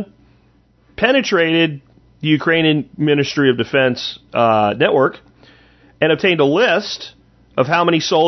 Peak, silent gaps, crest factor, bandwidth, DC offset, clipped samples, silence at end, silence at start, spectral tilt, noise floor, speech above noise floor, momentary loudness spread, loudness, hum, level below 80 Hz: 0 dBFS; none; 16 dB; 6.2 kHz; under 0.1%; under 0.1%; 0 s; 0 s; -5.5 dB/octave; -54 dBFS; 39 dB; 10 LU; -16 LUFS; none; -54 dBFS